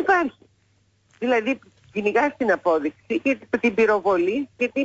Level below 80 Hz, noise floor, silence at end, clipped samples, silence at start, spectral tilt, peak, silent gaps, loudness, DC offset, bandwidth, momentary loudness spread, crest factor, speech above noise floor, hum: -62 dBFS; -63 dBFS; 0 s; under 0.1%; 0 s; -5.5 dB/octave; -8 dBFS; none; -22 LUFS; under 0.1%; 8 kHz; 9 LU; 16 dB; 42 dB; none